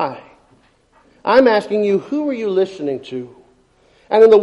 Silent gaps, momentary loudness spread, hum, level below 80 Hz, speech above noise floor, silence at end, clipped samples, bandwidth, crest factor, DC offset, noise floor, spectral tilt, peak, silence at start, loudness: none; 18 LU; none; -58 dBFS; 40 dB; 0 s; under 0.1%; 10.5 kHz; 16 dB; under 0.1%; -54 dBFS; -6.5 dB/octave; -2 dBFS; 0 s; -16 LUFS